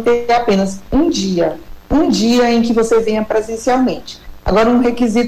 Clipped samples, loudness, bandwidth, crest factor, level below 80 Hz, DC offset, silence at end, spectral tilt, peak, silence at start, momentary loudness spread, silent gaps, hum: under 0.1%; -14 LUFS; 15.5 kHz; 8 dB; -34 dBFS; under 0.1%; 0 s; -5.5 dB/octave; -6 dBFS; 0 s; 7 LU; none; none